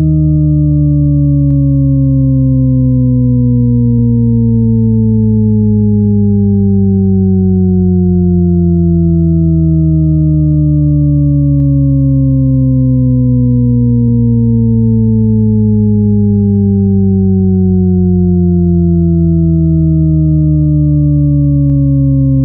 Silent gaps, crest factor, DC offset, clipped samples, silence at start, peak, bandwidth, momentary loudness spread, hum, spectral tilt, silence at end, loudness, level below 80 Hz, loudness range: none; 8 dB; under 0.1%; under 0.1%; 0 s; 0 dBFS; 1.3 kHz; 0 LU; none; -16.5 dB/octave; 0 s; -10 LUFS; -22 dBFS; 0 LU